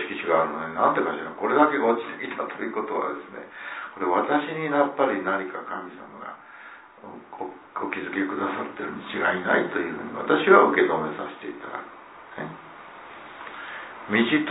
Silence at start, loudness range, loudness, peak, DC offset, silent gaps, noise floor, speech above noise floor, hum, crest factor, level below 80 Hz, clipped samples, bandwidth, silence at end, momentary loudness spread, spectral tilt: 0 s; 10 LU; -24 LUFS; -2 dBFS; under 0.1%; none; -46 dBFS; 21 dB; none; 22 dB; -70 dBFS; under 0.1%; 4 kHz; 0 s; 22 LU; -9 dB/octave